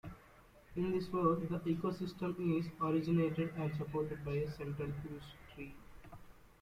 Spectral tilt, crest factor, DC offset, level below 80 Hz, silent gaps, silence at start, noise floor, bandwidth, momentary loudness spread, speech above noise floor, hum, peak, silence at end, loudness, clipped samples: -8.5 dB/octave; 20 dB; under 0.1%; -60 dBFS; none; 0.05 s; -62 dBFS; 15 kHz; 20 LU; 25 dB; none; -20 dBFS; 0.1 s; -38 LUFS; under 0.1%